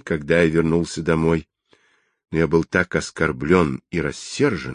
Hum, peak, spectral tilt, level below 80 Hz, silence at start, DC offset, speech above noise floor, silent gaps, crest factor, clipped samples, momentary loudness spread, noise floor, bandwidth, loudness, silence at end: none; -2 dBFS; -6 dB/octave; -40 dBFS; 0.05 s; under 0.1%; 43 dB; none; 18 dB; under 0.1%; 8 LU; -63 dBFS; 10.5 kHz; -21 LUFS; 0 s